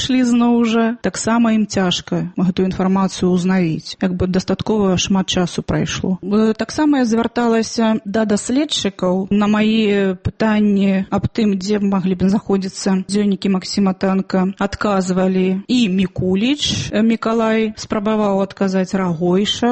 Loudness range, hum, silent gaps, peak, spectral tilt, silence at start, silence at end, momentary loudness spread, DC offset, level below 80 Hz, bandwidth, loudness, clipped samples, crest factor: 1 LU; none; none; -4 dBFS; -5.5 dB/octave; 0 s; 0 s; 5 LU; under 0.1%; -44 dBFS; 8.8 kHz; -17 LUFS; under 0.1%; 12 dB